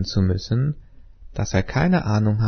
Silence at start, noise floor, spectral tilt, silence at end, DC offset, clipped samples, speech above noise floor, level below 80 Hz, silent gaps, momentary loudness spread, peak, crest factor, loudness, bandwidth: 0 s; -42 dBFS; -6.5 dB/octave; 0 s; under 0.1%; under 0.1%; 22 dB; -38 dBFS; none; 11 LU; -4 dBFS; 16 dB; -22 LUFS; 6.6 kHz